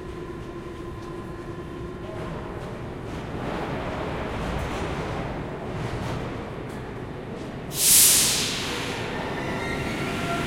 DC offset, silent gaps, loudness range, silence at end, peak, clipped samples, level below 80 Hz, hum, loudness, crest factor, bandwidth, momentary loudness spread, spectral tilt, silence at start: under 0.1%; none; 13 LU; 0 s; -4 dBFS; under 0.1%; -42 dBFS; none; -24 LUFS; 24 dB; 16.5 kHz; 18 LU; -2.5 dB/octave; 0 s